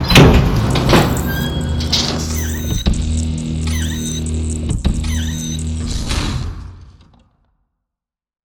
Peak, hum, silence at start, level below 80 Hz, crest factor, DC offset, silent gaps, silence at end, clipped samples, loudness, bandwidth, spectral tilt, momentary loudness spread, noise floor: 0 dBFS; none; 0 s; -22 dBFS; 16 dB; under 0.1%; none; 1.55 s; 0.2%; -17 LUFS; over 20 kHz; -5 dB/octave; 10 LU; -85 dBFS